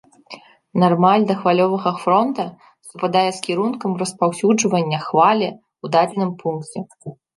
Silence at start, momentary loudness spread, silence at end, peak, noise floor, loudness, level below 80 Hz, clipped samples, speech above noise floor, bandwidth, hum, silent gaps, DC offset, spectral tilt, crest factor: 0.3 s; 13 LU; 0.25 s; -2 dBFS; -42 dBFS; -18 LUFS; -68 dBFS; under 0.1%; 24 dB; 11.5 kHz; none; none; under 0.1%; -5.5 dB/octave; 18 dB